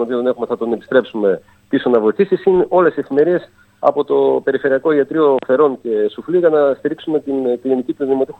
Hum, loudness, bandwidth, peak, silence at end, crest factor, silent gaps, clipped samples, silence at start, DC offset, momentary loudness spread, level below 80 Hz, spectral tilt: none; -16 LUFS; 4.4 kHz; 0 dBFS; 0.1 s; 14 dB; none; under 0.1%; 0 s; under 0.1%; 6 LU; -58 dBFS; -8.5 dB/octave